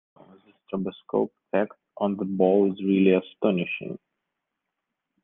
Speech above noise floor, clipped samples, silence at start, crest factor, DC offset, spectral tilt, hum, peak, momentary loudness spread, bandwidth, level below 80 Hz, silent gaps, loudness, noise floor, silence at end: 59 dB; under 0.1%; 0.7 s; 20 dB; under 0.1%; -10.5 dB/octave; none; -6 dBFS; 12 LU; 3.8 kHz; -72 dBFS; none; -25 LUFS; -83 dBFS; 1.3 s